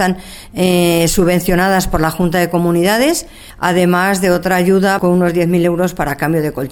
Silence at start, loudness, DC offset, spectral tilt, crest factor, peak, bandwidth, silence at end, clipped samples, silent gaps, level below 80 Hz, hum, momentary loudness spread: 0 s; -14 LUFS; under 0.1%; -5.5 dB/octave; 14 dB; 0 dBFS; 18 kHz; 0 s; under 0.1%; none; -32 dBFS; none; 6 LU